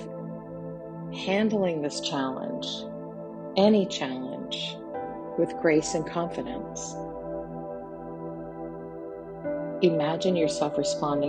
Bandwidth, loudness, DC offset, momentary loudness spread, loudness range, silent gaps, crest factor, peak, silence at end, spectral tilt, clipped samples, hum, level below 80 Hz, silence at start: 9.6 kHz; -29 LUFS; under 0.1%; 15 LU; 8 LU; none; 20 dB; -8 dBFS; 0 s; -5 dB/octave; under 0.1%; none; -58 dBFS; 0 s